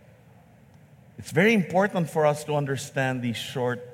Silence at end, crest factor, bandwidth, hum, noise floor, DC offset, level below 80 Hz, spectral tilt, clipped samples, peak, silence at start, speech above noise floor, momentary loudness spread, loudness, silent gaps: 0 s; 20 dB; 16.5 kHz; none; -53 dBFS; under 0.1%; -66 dBFS; -5.5 dB/octave; under 0.1%; -6 dBFS; 1.2 s; 29 dB; 9 LU; -25 LUFS; none